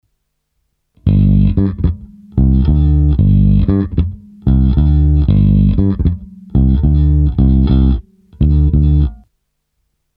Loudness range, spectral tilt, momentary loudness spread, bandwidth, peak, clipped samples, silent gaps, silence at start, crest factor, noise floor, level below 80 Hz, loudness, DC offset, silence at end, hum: 1 LU; -13 dB/octave; 8 LU; 4.3 kHz; 0 dBFS; under 0.1%; none; 1.05 s; 12 dB; -68 dBFS; -16 dBFS; -13 LUFS; under 0.1%; 1 s; none